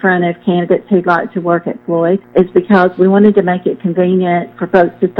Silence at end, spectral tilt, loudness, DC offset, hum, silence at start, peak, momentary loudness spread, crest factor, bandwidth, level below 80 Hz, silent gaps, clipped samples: 0 s; -10 dB/octave; -12 LUFS; under 0.1%; none; 0.05 s; 0 dBFS; 6 LU; 12 dB; 5.2 kHz; -52 dBFS; none; 0.3%